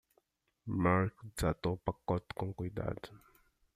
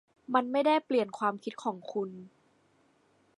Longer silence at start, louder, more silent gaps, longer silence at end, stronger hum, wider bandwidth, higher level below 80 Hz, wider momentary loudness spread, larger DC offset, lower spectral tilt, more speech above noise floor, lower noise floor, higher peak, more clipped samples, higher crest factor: first, 0.65 s vs 0.3 s; second, -36 LUFS vs -31 LUFS; neither; second, 0.6 s vs 1.1 s; neither; first, 14 kHz vs 11 kHz; first, -54 dBFS vs -86 dBFS; about the same, 12 LU vs 10 LU; neither; first, -7 dB/octave vs -5.5 dB/octave; about the same, 41 dB vs 38 dB; first, -76 dBFS vs -68 dBFS; second, -14 dBFS vs -10 dBFS; neither; about the same, 22 dB vs 22 dB